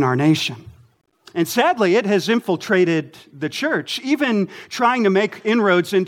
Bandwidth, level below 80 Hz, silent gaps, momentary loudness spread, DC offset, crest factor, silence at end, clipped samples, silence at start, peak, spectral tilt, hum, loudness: 17 kHz; -64 dBFS; none; 10 LU; under 0.1%; 16 dB; 0 s; under 0.1%; 0 s; -2 dBFS; -5.5 dB/octave; none; -19 LUFS